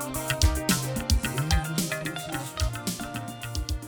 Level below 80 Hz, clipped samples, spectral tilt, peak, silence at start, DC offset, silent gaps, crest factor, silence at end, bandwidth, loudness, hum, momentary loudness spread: -32 dBFS; under 0.1%; -4 dB/octave; -10 dBFS; 0 s; under 0.1%; none; 18 dB; 0 s; over 20 kHz; -28 LUFS; none; 9 LU